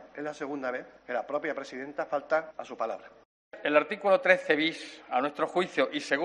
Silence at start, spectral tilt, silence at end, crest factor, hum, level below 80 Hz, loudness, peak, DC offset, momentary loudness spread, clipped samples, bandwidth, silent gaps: 0 s; -4 dB/octave; 0 s; 22 dB; none; -74 dBFS; -29 LUFS; -8 dBFS; under 0.1%; 14 LU; under 0.1%; 11 kHz; 3.25-3.51 s